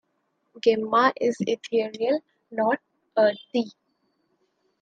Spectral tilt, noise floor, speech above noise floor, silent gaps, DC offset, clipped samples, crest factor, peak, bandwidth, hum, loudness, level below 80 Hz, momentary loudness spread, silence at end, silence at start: -5 dB/octave; -73 dBFS; 50 dB; none; under 0.1%; under 0.1%; 20 dB; -6 dBFS; 8.8 kHz; none; -25 LUFS; -76 dBFS; 9 LU; 1.1 s; 0.55 s